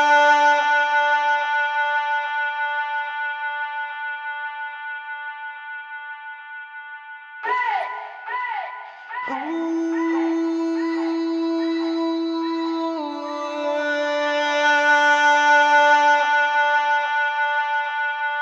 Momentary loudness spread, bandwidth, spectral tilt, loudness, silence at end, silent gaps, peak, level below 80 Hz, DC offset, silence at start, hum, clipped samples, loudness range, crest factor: 18 LU; 8.4 kHz; -0.5 dB/octave; -20 LUFS; 0 s; none; -6 dBFS; -82 dBFS; under 0.1%; 0 s; none; under 0.1%; 12 LU; 16 dB